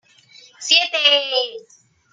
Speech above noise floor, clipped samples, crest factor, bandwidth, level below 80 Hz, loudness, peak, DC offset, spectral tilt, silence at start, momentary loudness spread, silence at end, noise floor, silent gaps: 31 dB; under 0.1%; 20 dB; 13.5 kHz; -82 dBFS; -15 LUFS; 0 dBFS; under 0.1%; 2 dB/octave; 0.6 s; 13 LU; 0.5 s; -49 dBFS; none